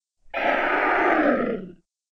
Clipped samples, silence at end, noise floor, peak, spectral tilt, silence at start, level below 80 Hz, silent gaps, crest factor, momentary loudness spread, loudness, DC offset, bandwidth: under 0.1%; 0.4 s; -43 dBFS; -8 dBFS; -6.5 dB/octave; 0.35 s; -50 dBFS; none; 16 dB; 11 LU; -22 LUFS; under 0.1%; 16 kHz